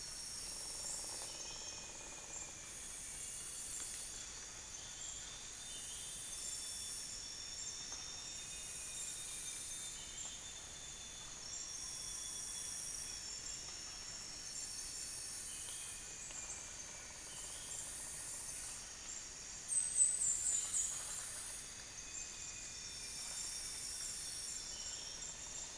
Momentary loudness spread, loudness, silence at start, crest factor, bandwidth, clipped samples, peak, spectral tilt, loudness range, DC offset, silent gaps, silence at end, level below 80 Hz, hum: 10 LU; -42 LUFS; 0 s; 26 dB; 10.5 kHz; under 0.1%; -20 dBFS; 0.5 dB/octave; 8 LU; under 0.1%; none; 0 s; -64 dBFS; none